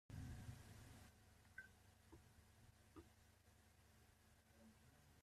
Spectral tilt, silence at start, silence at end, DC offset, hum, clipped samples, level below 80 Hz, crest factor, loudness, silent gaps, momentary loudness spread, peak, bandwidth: -5 dB/octave; 0.1 s; 0 s; under 0.1%; none; under 0.1%; -72 dBFS; 18 dB; -62 LUFS; none; 12 LU; -44 dBFS; 14.5 kHz